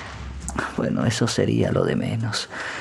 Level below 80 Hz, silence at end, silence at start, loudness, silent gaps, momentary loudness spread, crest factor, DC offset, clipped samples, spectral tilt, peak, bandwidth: -42 dBFS; 0 s; 0 s; -24 LUFS; none; 9 LU; 18 dB; under 0.1%; under 0.1%; -5.5 dB/octave; -6 dBFS; 13.5 kHz